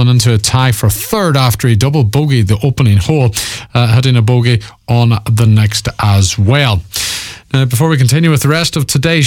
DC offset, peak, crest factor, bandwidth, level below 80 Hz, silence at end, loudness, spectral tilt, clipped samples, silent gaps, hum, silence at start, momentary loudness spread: under 0.1%; 0 dBFS; 10 dB; 18 kHz; -34 dBFS; 0 s; -11 LUFS; -5 dB/octave; under 0.1%; none; none; 0 s; 6 LU